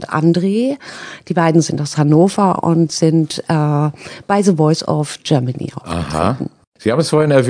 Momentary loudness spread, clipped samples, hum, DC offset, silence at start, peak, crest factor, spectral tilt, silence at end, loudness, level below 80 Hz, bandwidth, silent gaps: 11 LU; under 0.1%; none; under 0.1%; 0 s; 0 dBFS; 14 dB; -6.5 dB/octave; 0 s; -15 LUFS; -46 dBFS; 10 kHz; 6.67-6.72 s